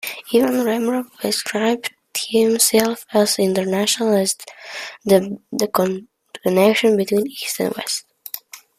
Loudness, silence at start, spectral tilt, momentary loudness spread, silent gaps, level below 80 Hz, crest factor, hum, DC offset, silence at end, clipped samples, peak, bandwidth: -19 LUFS; 0.05 s; -3.5 dB/octave; 13 LU; none; -64 dBFS; 20 dB; none; under 0.1%; 0.2 s; under 0.1%; 0 dBFS; 15.5 kHz